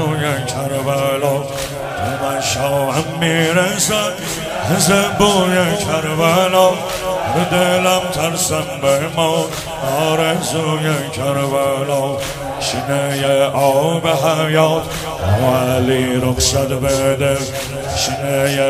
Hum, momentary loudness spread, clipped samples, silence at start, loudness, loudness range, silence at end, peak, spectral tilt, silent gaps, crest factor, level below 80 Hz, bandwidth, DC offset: none; 8 LU; under 0.1%; 0 s; -16 LUFS; 3 LU; 0 s; 0 dBFS; -4 dB/octave; none; 16 dB; -40 dBFS; 16 kHz; under 0.1%